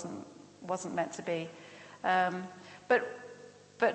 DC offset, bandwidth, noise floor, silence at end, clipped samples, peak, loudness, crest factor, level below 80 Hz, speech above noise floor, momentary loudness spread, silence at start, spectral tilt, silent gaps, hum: under 0.1%; 8.4 kHz; -53 dBFS; 0 s; under 0.1%; -14 dBFS; -33 LUFS; 20 dB; -82 dBFS; 20 dB; 21 LU; 0 s; -4.5 dB/octave; none; 50 Hz at -65 dBFS